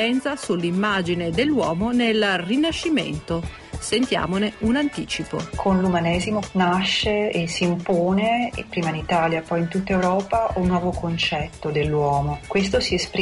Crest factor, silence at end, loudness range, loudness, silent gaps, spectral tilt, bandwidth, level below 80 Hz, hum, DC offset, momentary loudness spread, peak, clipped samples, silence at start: 12 dB; 0 s; 2 LU; -22 LUFS; none; -5.5 dB/octave; 11.5 kHz; -40 dBFS; none; under 0.1%; 6 LU; -10 dBFS; under 0.1%; 0 s